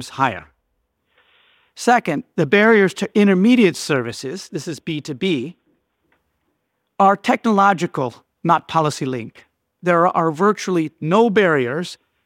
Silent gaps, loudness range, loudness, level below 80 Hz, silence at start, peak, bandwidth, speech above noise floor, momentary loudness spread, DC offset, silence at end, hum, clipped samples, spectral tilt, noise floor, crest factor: none; 5 LU; -18 LUFS; -66 dBFS; 0 s; -2 dBFS; 15.5 kHz; 54 dB; 14 LU; under 0.1%; 0.3 s; none; under 0.1%; -5.5 dB/octave; -72 dBFS; 16 dB